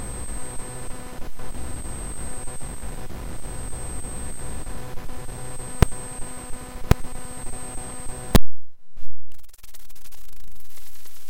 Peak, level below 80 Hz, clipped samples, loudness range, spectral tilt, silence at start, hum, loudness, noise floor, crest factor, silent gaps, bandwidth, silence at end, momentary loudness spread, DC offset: 0 dBFS; -32 dBFS; under 0.1%; 8 LU; -4.5 dB/octave; 0 s; none; -31 LUFS; -44 dBFS; 20 dB; none; 16.5 kHz; 0 s; 23 LU; under 0.1%